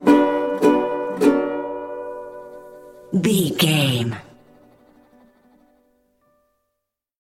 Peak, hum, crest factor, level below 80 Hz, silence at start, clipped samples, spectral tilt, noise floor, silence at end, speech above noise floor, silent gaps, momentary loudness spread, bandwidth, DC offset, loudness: -2 dBFS; none; 20 dB; -60 dBFS; 0 s; under 0.1%; -5.5 dB/octave; -79 dBFS; 2.95 s; 60 dB; none; 20 LU; 16.5 kHz; under 0.1%; -20 LUFS